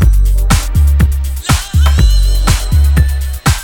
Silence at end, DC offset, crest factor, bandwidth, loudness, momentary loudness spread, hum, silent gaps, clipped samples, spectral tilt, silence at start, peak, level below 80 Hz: 0 s; under 0.1%; 10 dB; 18.5 kHz; -12 LUFS; 4 LU; none; none; under 0.1%; -4.5 dB/octave; 0 s; 0 dBFS; -10 dBFS